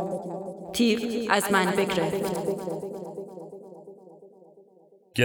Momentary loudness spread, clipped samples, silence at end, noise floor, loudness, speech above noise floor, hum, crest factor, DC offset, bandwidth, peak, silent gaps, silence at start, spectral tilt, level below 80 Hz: 21 LU; under 0.1%; 0 s; -58 dBFS; -27 LUFS; 31 dB; none; 24 dB; under 0.1%; over 20 kHz; -4 dBFS; none; 0 s; -4.5 dB/octave; -62 dBFS